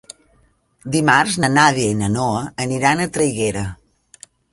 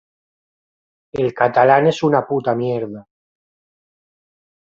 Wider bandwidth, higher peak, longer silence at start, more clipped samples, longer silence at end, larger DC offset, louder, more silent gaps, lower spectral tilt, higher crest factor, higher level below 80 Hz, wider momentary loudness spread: first, 12 kHz vs 7.6 kHz; about the same, 0 dBFS vs -2 dBFS; second, 0.85 s vs 1.15 s; neither; second, 0.8 s vs 1.65 s; neither; about the same, -17 LUFS vs -17 LUFS; neither; second, -4.5 dB/octave vs -7 dB/octave; about the same, 20 dB vs 18 dB; first, -46 dBFS vs -60 dBFS; second, 9 LU vs 17 LU